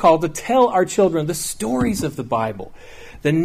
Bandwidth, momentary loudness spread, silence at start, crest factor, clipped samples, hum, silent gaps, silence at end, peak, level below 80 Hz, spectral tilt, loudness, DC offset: 15.5 kHz; 9 LU; 0 s; 16 dB; under 0.1%; none; none; 0 s; -4 dBFS; -44 dBFS; -5.5 dB/octave; -19 LUFS; under 0.1%